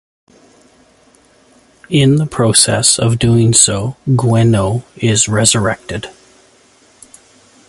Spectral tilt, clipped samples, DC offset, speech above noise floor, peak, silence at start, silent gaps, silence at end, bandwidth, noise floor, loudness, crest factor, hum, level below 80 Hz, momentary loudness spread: -4 dB/octave; under 0.1%; under 0.1%; 37 dB; 0 dBFS; 1.9 s; none; 1.6 s; 16 kHz; -49 dBFS; -12 LUFS; 14 dB; none; -40 dBFS; 10 LU